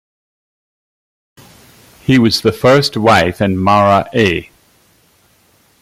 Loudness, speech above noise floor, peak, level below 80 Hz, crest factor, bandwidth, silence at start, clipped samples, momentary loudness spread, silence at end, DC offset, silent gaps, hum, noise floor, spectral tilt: -12 LUFS; 42 dB; 0 dBFS; -46 dBFS; 14 dB; 16 kHz; 2.1 s; under 0.1%; 5 LU; 1.4 s; under 0.1%; none; none; -53 dBFS; -5.5 dB/octave